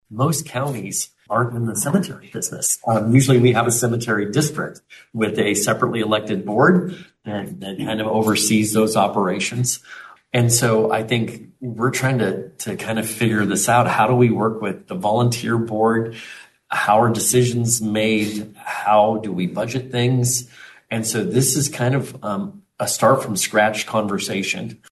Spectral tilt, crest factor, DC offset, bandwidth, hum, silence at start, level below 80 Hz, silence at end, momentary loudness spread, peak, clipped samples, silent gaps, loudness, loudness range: -4.5 dB/octave; 18 dB; under 0.1%; 12.5 kHz; none; 0.1 s; -58 dBFS; 0.15 s; 13 LU; -2 dBFS; under 0.1%; none; -19 LUFS; 2 LU